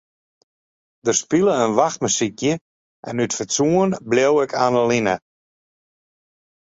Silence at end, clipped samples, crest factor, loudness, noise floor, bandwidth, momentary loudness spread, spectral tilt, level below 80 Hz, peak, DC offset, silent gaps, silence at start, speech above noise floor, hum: 1.5 s; under 0.1%; 20 dB; -19 LUFS; under -90 dBFS; 8 kHz; 9 LU; -4 dB/octave; -60 dBFS; -2 dBFS; under 0.1%; 2.61-3.03 s; 1.05 s; over 71 dB; none